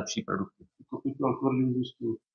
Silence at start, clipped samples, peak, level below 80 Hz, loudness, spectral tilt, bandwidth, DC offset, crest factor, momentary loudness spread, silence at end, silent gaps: 0 s; under 0.1%; -14 dBFS; -70 dBFS; -31 LUFS; -6 dB/octave; 7.2 kHz; under 0.1%; 18 dB; 10 LU; 0.2 s; none